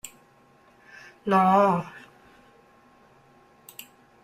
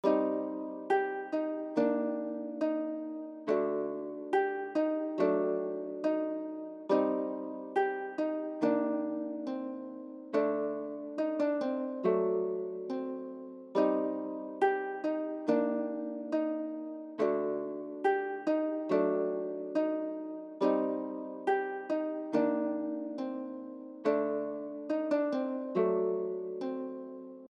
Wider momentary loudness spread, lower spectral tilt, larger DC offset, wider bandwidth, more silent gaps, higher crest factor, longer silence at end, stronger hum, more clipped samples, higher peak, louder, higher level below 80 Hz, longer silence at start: first, 28 LU vs 10 LU; about the same, -6.5 dB/octave vs -7.5 dB/octave; neither; first, 15.5 kHz vs 7.2 kHz; neither; about the same, 20 dB vs 16 dB; first, 2.25 s vs 0 s; neither; neither; first, -8 dBFS vs -16 dBFS; first, -22 LUFS vs -33 LUFS; first, -68 dBFS vs under -90 dBFS; about the same, 0.05 s vs 0.05 s